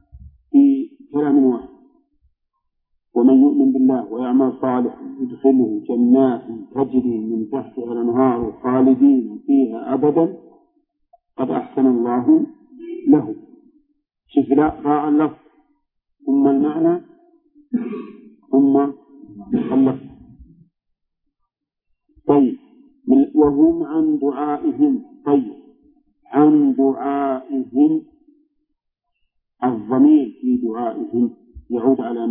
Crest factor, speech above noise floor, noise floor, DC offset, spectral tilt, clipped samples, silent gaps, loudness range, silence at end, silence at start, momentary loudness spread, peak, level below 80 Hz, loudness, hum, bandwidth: 16 dB; 58 dB; -75 dBFS; under 0.1%; -12.5 dB/octave; under 0.1%; none; 4 LU; 0 s; 0.15 s; 12 LU; -2 dBFS; -54 dBFS; -18 LUFS; none; 3.6 kHz